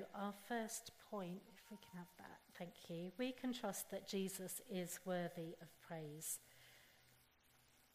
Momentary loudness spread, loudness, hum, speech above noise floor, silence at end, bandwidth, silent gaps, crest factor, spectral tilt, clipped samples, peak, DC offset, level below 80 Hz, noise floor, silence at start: 15 LU; -48 LUFS; none; 25 dB; 0.1 s; 15.5 kHz; none; 18 dB; -4 dB/octave; under 0.1%; -32 dBFS; under 0.1%; -84 dBFS; -74 dBFS; 0 s